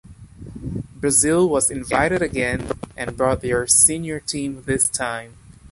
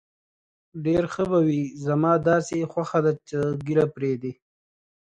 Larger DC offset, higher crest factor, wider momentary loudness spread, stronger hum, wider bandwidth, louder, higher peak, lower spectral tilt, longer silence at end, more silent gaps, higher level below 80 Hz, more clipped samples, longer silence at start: neither; about the same, 22 dB vs 18 dB; first, 17 LU vs 8 LU; neither; first, 13.5 kHz vs 9.2 kHz; first, -19 LUFS vs -24 LUFS; first, 0 dBFS vs -6 dBFS; second, -3.5 dB/octave vs -7.5 dB/octave; second, 0.05 s vs 0.7 s; neither; first, -42 dBFS vs -58 dBFS; neither; second, 0.1 s vs 0.75 s